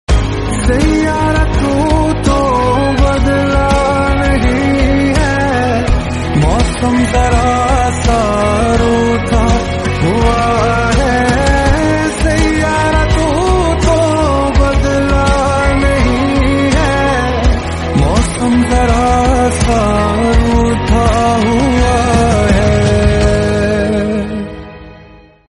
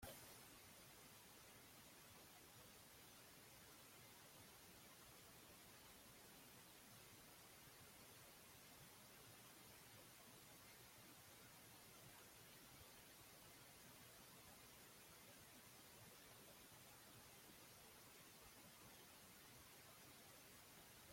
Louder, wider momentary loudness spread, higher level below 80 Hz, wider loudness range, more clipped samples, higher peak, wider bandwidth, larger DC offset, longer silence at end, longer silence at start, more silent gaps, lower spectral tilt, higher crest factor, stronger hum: first, -12 LUFS vs -63 LUFS; about the same, 3 LU vs 1 LU; first, -16 dBFS vs -82 dBFS; about the same, 1 LU vs 0 LU; neither; first, 0 dBFS vs -44 dBFS; second, 11.5 kHz vs 16.5 kHz; neither; first, 0.45 s vs 0 s; about the same, 0.1 s vs 0 s; neither; first, -6 dB/octave vs -2.5 dB/octave; second, 10 dB vs 22 dB; neither